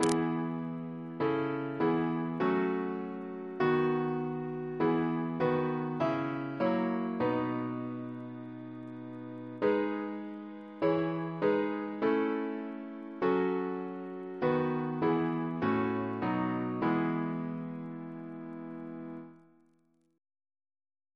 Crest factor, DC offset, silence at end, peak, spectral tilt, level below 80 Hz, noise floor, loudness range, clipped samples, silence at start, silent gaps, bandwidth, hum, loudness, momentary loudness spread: 24 dB; under 0.1%; 1.8 s; -8 dBFS; -7 dB/octave; -70 dBFS; -71 dBFS; 5 LU; under 0.1%; 0 s; none; 11 kHz; none; -33 LUFS; 13 LU